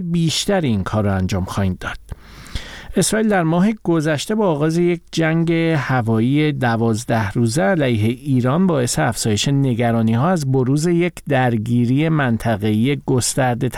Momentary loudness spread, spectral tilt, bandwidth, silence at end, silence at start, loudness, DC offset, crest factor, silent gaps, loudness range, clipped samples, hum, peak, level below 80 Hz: 5 LU; -5.5 dB/octave; 16.5 kHz; 0 s; 0 s; -18 LUFS; 0.2%; 12 dB; none; 3 LU; under 0.1%; none; -4 dBFS; -42 dBFS